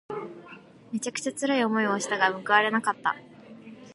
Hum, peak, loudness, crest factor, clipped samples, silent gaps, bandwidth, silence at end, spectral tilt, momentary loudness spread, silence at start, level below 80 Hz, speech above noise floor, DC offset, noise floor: none; -6 dBFS; -26 LUFS; 22 dB; under 0.1%; none; 11.5 kHz; 0 s; -3 dB/octave; 20 LU; 0.1 s; -76 dBFS; 23 dB; under 0.1%; -49 dBFS